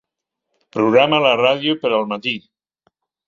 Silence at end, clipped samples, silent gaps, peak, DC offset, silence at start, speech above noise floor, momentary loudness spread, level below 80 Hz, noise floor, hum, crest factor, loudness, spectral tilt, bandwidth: 0.9 s; under 0.1%; none; -2 dBFS; under 0.1%; 0.75 s; 64 dB; 11 LU; -64 dBFS; -80 dBFS; none; 18 dB; -16 LUFS; -6 dB/octave; 7.2 kHz